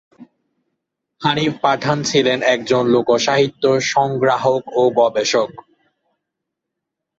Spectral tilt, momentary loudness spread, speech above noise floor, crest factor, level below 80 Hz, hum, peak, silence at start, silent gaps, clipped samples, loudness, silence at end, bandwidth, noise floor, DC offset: -4.5 dB/octave; 3 LU; 64 dB; 16 dB; -60 dBFS; none; -2 dBFS; 0.2 s; none; under 0.1%; -17 LUFS; 1.6 s; 8 kHz; -80 dBFS; under 0.1%